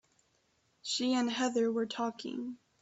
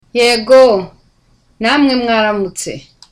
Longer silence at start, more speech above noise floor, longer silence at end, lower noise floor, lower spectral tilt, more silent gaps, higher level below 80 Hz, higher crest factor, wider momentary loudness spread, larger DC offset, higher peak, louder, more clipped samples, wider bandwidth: first, 0.85 s vs 0.15 s; about the same, 41 dB vs 42 dB; about the same, 0.25 s vs 0.3 s; first, -74 dBFS vs -53 dBFS; about the same, -3 dB/octave vs -3.5 dB/octave; neither; second, -78 dBFS vs -46 dBFS; about the same, 16 dB vs 12 dB; second, 11 LU vs 17 LU; neither; second, -20 dBFS vs 0 dBFS; second, -33 LUFS vs -11 LUFS; neither; second, 8.2 kHz vs 15 kHz